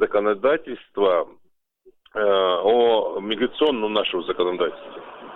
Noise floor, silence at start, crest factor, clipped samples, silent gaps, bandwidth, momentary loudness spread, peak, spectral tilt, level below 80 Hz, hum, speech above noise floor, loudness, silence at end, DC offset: -57 dBFS; 0 s; 16 dB; under 0.1%; none; 4.1 kHz; 15 LU; -6 dBFS; -6.5 dB/octave; -60 dBFS; none; 36 dB; -21 LUFS; 0 s; under 0.1%